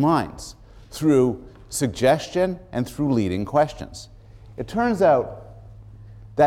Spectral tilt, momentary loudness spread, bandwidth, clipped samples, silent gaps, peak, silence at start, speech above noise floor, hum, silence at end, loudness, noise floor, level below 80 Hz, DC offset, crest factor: -6 dB/octave; 20 LU; 16.5 kHz; under 0.1%; none; -6 dBFS; 0 s; 21 dB; none; 0 s; -22 LUFS; -42 dBFS; -46 dBFS; under 0.1%; 16 dB